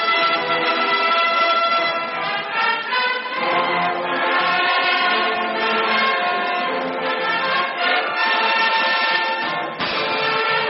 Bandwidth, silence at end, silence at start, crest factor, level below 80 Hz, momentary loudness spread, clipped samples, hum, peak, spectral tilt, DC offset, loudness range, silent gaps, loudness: 6 kHz; 0 s; 0 s; 14 dB; -68 dBFS; 5 LU; under 0.1%; none; -6 dBFS; 1 dB/octave; under 0.1%; 1 LU; none; -18 LUFS